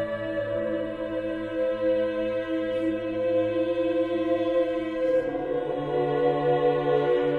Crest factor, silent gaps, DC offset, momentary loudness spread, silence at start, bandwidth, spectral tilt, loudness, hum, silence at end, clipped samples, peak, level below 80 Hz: 14 dB; none; under 0.1%; 6 LU; 0 s; 4.7 kHz; -8 dB/octave; -26 LUFS; none; 0 s; under 0.1%; -12 dBFS; -54 dBFS